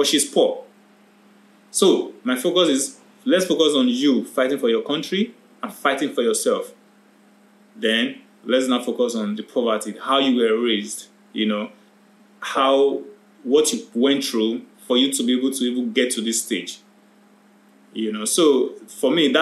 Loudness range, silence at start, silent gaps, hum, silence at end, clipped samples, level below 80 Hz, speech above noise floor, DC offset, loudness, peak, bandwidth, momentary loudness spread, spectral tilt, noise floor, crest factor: 4 LU; 0 s; none; none; 0 s; under 0.1%; -80 dBFS; 34 dB; under 0.1%; -20 LUFS; -4 dBFS; 15 kHz; 13 LU; -3 dB/octave; -53 dBFS; 18 dB